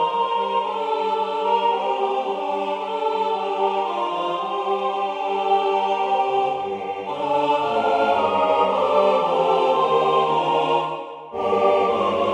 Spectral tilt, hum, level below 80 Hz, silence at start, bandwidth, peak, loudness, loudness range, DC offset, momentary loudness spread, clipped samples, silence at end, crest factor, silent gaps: -5 dB/octave; none; -66 dBFS; 0 s; 10 kHz; -4 dBFS; -21 LUFS; 4 LU; under 0.1%; 6 LU; under 0.1%; 0 s; 16 dB; none